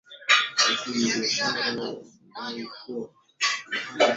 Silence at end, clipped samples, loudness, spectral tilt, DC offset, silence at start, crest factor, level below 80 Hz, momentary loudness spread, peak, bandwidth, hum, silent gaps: 0 s; under 0.1%; -24 LUFS; -1.5 dB/octave; under 0.1%; 0.1 s; 22 dB; -72 dBFS; 17 LU; -4 dBFS; 8.2 kHz; none; none